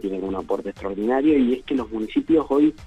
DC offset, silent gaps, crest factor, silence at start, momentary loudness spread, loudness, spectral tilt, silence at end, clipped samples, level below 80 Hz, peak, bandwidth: under 0.1%; none; 14 dB; 0.05 s; 9 LU; -22 LUFS; -7.5 dB/octave; 0 s; under 0.1%; -48 dBFS; -8 dBFS; 8.2 kHz